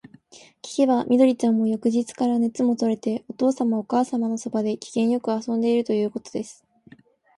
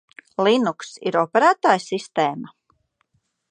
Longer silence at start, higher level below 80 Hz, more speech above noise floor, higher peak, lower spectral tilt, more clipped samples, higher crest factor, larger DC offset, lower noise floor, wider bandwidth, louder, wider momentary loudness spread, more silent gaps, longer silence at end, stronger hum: first, 0.65 s vs 0.4 s; about the same, -70 dBFS vs -74 dBFS; second, 30 dB vs 49 dB; second, -6 dBFS vs 0 dBFS; first, -6 dB/octave vs -4.5 dB/octave; neither; second, 16 dB vs 22 dB; neither; second, -53 dBFS vs -69 dBFS; first, 11.5 kHz vs 10 kHz; second, -23 LUFS vs -20 LUFS; second, 10 LU vs 15 LU; neither; second, 0.85 s vs 1.05 s; neither